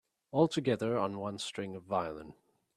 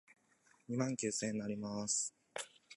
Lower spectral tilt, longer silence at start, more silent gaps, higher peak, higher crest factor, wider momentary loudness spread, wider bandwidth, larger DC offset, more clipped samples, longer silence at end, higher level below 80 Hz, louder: first, -6 dB/octave vs -3.5 dB/octave; second, 0.35 s vs 0.7 s; neither; first, -14 dBFS vs -22 dBFS; about the same, 20 dB vs 20 dB; about the same, 12 LU vs 11 LU; first, 13 kHz vs 11.5 kHz; neither; neither; first, 0.45 s vs 0 s; first, -70 dBFS vs -78 dBFS; first, -34 LUFS vs -39 LUFS